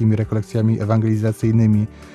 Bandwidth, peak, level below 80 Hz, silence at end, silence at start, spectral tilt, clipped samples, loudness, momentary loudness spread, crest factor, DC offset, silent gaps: 11 kHz; -4 dBFS; -46 dBFS; 0.05 s; 0 s; -9 dB/octave; under 0.1%; -18 LUFS; 5 LU; 12 dB; under 0.1%; none